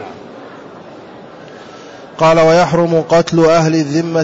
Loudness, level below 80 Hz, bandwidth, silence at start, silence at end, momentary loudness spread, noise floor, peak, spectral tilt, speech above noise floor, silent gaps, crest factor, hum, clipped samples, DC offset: -11 LUFS; -46 dBFS; 8 kHz; 0 s; 0 s; 24 LU; -34 dBFS; -2 dBFS; -6 dB/octave; 23 dB; none; 12 dB; none; under 0.1%; under 0.1%